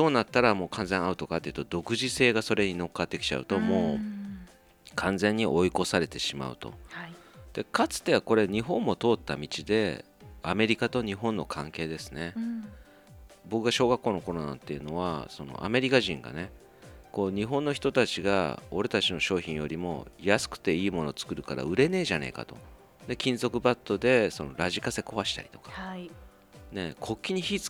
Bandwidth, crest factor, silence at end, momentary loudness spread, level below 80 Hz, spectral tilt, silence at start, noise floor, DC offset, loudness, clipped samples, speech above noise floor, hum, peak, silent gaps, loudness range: 19 kHz; 24 dB; 0 s; 15 LU; -54 dBFS; -4.5 dB/octave; 0 s; -54 dBFS; under 0.1%; -29 LUFS; under 0.1%; 26 dB; none; -6 dBFS; none; 3 LU